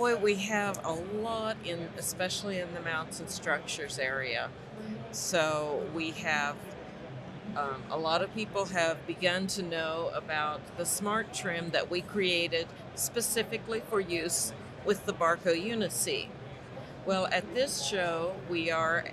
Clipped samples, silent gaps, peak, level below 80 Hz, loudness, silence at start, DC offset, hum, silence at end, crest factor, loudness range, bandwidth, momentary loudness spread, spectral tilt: under 0.1%; none; -14 dBFS; -64 dBFS; -32 LUFS; 0 s; under 0.1%; none; 0 s; 18 dB; 3 LU; 13.5 kHz; 10 LU; -3 dB/octave